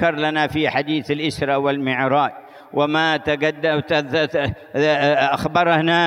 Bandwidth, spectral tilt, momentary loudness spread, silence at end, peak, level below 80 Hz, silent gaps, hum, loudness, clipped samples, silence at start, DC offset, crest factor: 15.5 kHz; -6 dB/octave; 6 LU; 0 s; -4 dBFS; -50 dBFS; none; none; -19 LUFS; under 0.1%; 0 s; under 0.1%; 16 dB